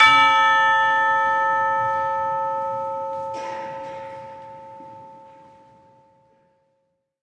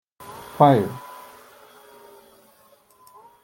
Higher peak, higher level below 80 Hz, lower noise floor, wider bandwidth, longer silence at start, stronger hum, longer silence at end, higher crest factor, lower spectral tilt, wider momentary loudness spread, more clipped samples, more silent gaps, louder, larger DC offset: about the same, 0 dBFS vs -2 dBFS; about the same, -68 dBFS vs -66 dBFS; first, -72 dBFS vs -56 dBFS; second, 10 kHz vs 17 kHz; second, 0 s vs 0.3 s; neither; second, 2 s vs 2.45 s; about the same, 22 dB vs 24 dB; second, -2 dB/octave vs -7.5 dB/octave; about the same, 25 LU vs 26 LU; neither; neither; about the same, -19 LUFS vs -19 LUFS; neither